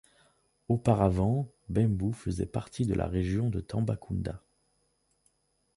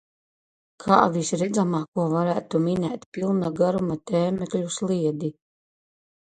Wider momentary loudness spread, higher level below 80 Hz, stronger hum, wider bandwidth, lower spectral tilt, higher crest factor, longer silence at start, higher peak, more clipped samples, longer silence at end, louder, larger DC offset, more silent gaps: about the same, 9 LU vs 8 LU; first, -46 dBFS vs -60 dBFS; neither; first, 11.5 kHz vs 9.4 kHz; first, -8.5 dB/octave vs -6.5 dB/octave; about the same, 20 dB vs 22 dB; about the same, 0.7 s vs 0.8 s; second, -10 dBFS vs -2 dBFS; neither; first, 1.4 s vs 1.05 s; second, -30 LUFS vs -24 LUFS; neither; second, none vs 1.88-1.92 s, 3.06-3.12 s